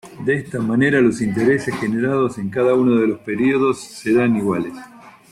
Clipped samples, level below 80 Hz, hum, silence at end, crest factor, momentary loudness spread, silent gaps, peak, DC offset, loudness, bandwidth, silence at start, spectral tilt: under 0.1%; -54 dBFS; none; 0.2 s; 14 dB; 7 LU; none; -4 dBFS; under 0.1%; -18 LUFS; 13 kHz; 0.05 s; -7 dB/octave